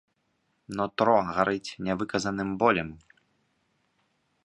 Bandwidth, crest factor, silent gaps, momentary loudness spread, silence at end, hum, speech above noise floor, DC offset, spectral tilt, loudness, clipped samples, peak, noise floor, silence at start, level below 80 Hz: 11.5 kHz; 22 dB; none; 9 LU; 1.45 s; none; 47 dB; under 0.1%; -5.5 dB/octave; -27 LUFS; under 0.1%; -6 dBFS; -74 dBFS; 0.7 s; -58 dBFS